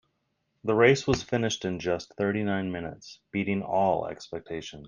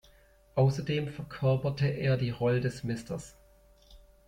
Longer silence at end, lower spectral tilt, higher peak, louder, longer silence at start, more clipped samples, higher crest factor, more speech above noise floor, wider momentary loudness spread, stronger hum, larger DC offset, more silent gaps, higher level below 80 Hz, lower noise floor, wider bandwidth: second, 0 s vs 0.3 s; second, -5.5 dB/octave vs -7 dB/octave; first, -6 dBFS vs -12 dBFS; first, -28 LUFS vs -31 LUFS; about the same, 0.65 s vs 0.55 s; neither; about the same, 22 dB vs 18 dB; first, 49 dB vs 31 dB; first, 15 LU vs 11 LU; neither; neither; neither; about the same, -56 dBFS vs -56 dBFS; first, -76 dBFS vs -60 dBFS; about the same, 9.8 kHz vs 10.5 kHz